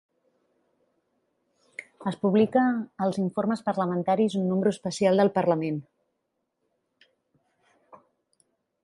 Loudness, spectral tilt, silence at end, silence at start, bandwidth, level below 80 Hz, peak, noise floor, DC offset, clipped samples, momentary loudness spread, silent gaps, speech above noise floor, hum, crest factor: -25 LUFS; -7 dB/octave; 3 s; 1.8 s; 11.5 kHz; -72 dBFS; -10 dBFS; -79 dBFS; under 0.1%; under 0.1%; 12 LU; none; 55 dB; none; 18 dB